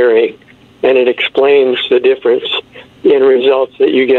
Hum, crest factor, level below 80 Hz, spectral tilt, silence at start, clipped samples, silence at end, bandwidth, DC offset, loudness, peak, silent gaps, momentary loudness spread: none; 10 dB; -58 dBFS; -6 dB/octave; 0 s; under 0.1%; 0 s; 4.3 kHz; under 0.1%; -11 LUFS; 0 dBFS; none; 7 LU